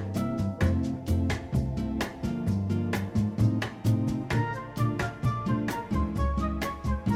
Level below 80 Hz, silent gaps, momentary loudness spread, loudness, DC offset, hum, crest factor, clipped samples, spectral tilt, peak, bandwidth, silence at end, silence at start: -38 dBFS; none; 4 LU; -29 LUFS; under 0.1%; none; 14 dB; under 0.1%; -7 dB/octave; -14 dBFS; 16 kHz; 0 s; 0 s